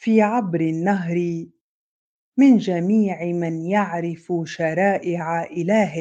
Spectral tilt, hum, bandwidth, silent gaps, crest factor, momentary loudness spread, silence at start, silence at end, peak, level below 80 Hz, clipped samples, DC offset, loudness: -7.5 dB/octave; none; 8 kHz; 1.61-2.32 s; 16 dB; 10 LU; 0 s; 0 s; -4 dBFS; -68 dBFS; under 0.1%; under 0.1%; -21 LUFS